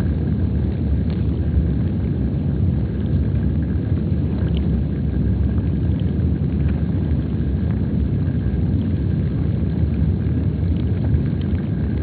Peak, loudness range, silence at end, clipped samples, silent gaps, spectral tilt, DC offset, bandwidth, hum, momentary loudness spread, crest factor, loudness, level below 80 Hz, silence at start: -6 dBFS; 0 LU; 0 s; under 0.1%; none; -10 dB/octave; under 0.1%; 4.5 kHz; none; 2 LU; 12 dB; -21 LUFS; -24 dBFS; 0 s